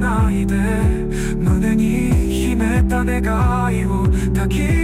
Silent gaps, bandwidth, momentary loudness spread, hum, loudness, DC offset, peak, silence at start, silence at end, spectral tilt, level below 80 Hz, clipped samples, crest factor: none; 15.5 kHz; 2 LU; none; -18 LUFS; under 0.1%; -6 dBFS; 0 s; 0 s; -7 dB/octave; -22 dBFS; under 0.1%; 10 dB